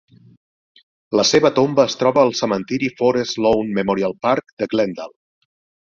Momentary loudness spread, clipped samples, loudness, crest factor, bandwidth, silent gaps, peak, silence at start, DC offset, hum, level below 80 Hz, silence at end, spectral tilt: 8 LU; under 0.1%; -18 LUFS; 18 dB; 7.4 kHz; 4.53-4.57 s; -2 dBFS; 1.1 s; under 0.1%; none; -56 dBFS; 0.75 s; -4.5 dB/octave